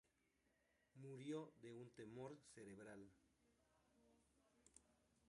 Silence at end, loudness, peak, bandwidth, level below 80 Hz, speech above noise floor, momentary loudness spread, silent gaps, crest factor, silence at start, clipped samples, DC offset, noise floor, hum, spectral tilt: 0 s; -58 LUFS; -40 dBFS; 11 kHz; -88 dBFS; 28 dB; 11 LU; none; 20 dB; 0.95 s; under 0.1%; under 0.1%; -85 dBFS; none; -6 dB/octave